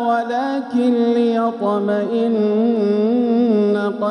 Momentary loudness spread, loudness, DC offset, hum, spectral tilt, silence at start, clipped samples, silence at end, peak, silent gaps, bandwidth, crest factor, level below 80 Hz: 4 LU; -17 LUFS; under 0.1%; none; -8 dB/octave; 0 s; under 0.1%; 0 s; -8 dBFS; none; 9.2 kHz; 10 dB; -70 dBFS